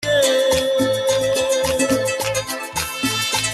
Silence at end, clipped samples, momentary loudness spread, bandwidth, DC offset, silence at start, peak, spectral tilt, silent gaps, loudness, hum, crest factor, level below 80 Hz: 0 s; under 0.1%; 7 LU; 13 kHz; under 0.1%; 0 s; -4 dBFS; -2.5 dB/octave; none; -19 LUFS; none; 14 dB; -46 dBFS